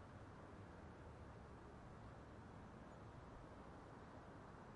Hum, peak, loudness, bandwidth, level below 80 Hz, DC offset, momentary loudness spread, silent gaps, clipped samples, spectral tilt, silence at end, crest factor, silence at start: none; -46 dBFS; -60 LUFS; 10.5 kHz; -68 dBFS; under 0.1%; 0 LU; none; under 0.1%; -7 dB/octave; 0 s; 12 dB; 0 s